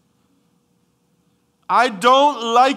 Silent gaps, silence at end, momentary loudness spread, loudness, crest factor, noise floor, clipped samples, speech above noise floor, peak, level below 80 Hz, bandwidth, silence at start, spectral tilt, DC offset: none; 0 s; 4 LU; -15 LUFS; 16 dB; -63 dBFS; under 0.1%; 49 dB; -2 dBFS; -78 dBFS; 15 kHz; 1.7 s; -3 dB/octave; under 0.1%